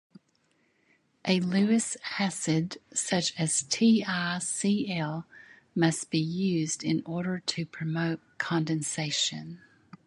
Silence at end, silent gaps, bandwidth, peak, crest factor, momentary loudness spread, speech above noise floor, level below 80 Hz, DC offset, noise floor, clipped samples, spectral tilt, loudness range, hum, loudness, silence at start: 0.5 s; none; 11.5 kHz; -8 dBFS; 20 dB; 9 LU; 42 dB; -70 dBFS; under 0.1%; -70 dBFS; under 0.1%; -4 dB/octave; 3 LU; none; -28 LUFS; 1.25 s